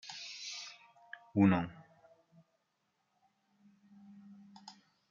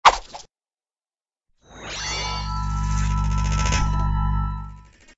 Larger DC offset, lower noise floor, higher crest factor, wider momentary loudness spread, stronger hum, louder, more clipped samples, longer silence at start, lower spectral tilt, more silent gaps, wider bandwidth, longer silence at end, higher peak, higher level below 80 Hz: neither; second, -81 dBFS vs under -90 dBFS; about the same, 24 dB vs 24 dB; first, 28 LU vs 15 LU; neither; second, -34 LUFS vs -24 LUFS; neither; about the same, 0.05 s vs 0.05 s; first, -6 dB/octave vs -4 dB/octave; neither; about the same, 7.4 kHz vs 8 kHz; about the same, 0.4 s vs 0.35 s; second, -16 dBFS vs 0 dBFS; second, -76 dBFS vs -28 dBFS